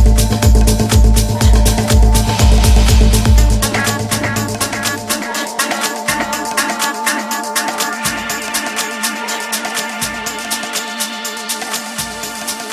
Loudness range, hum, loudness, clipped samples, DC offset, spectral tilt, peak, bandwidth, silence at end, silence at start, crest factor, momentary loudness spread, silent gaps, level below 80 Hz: 7 LU; none; -15 LUFS; under 0.1%; under 0.1%; -4 dB/octave; 0 dBFS; 15.5 kHz; 0 s; 0 s; 14 dB; 9 LU; none; -16 dBFS